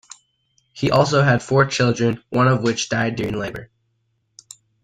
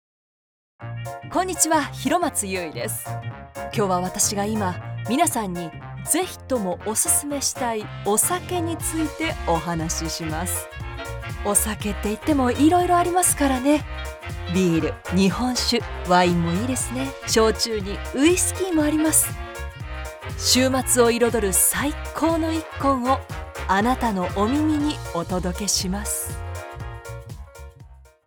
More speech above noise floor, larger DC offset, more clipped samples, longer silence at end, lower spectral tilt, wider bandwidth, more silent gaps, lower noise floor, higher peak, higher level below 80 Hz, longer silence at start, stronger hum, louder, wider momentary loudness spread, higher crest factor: first, 50 dB vs 24 dB; neither; neither; first, 1.2 s vs 0.25 s; first, -5.5 dB/octave vs -3.5 dB/octave; second, 9.4 kHz vs over 20 kHz; neither; first, -69 dBFS vs -47 dBFS; about the same, -2 dBFS vs -4 dBFS; second, -50 dBFS vs -38 dBFS; about the same, 0.75 s vs 0.8 s; neither; first, -19 LUFS vs -22 LUFS; second, 9 LU vs 15 LU; about the same, 18 dB vs 20 dB